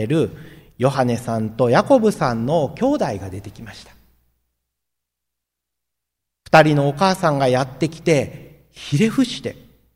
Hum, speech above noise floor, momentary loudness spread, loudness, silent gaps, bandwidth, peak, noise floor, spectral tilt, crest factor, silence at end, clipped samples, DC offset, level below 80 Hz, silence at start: none; 64 dB; 17 LU; -18 LUFS; none; 16 kHz; 0 dBFS; -82 dBFS; -6 dB/octave; 20 dB; 0.45 s; under 0.1%; under 0.1%; -52 dBFS; 0 s